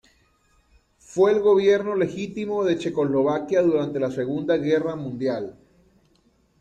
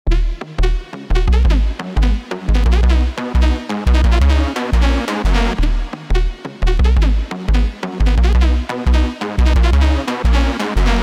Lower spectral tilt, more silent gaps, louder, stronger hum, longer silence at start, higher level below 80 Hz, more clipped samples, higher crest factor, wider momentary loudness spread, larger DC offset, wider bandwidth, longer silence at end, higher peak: about the same, -6.5 dB/octave vs -6.5 dB/octave; neither; second, -22 LUFS vs -17 LUFS; neither; first, 1.1 s vs 0.05 s; second, -62 dBFS vs -14 dBFS; neither; about the same, 16 dB vs 12 dB; first, 10 LU vs 7 LU; neither; about the same, 8.8 kHz vs 9.4 kHz; first, 1.1 s vs 0 s; second, -8 dBFS vs -2 dBFS